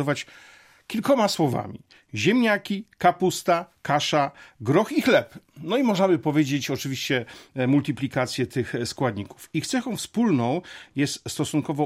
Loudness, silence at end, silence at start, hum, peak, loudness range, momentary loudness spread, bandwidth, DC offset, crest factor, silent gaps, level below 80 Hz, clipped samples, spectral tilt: -24 LUFS; 0 s; 0 s; none; -6 dBFS; 3 LU; 11 LU; 16 kHz; under 0.1%; 18 dB; none; -64 dBFS; under 0.1%; -5 dB/octave